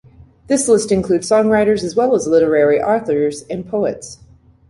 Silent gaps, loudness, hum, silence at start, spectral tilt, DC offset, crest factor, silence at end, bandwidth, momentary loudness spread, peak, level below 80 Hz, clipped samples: none; -15 LUFS; none; 0.5 s; -5 dB/octave; under 0.1%; 14 dB; 0.55 s; 11.5 kHz; 9 LU; -2 dBFS; -48 dBFS; under 0.1%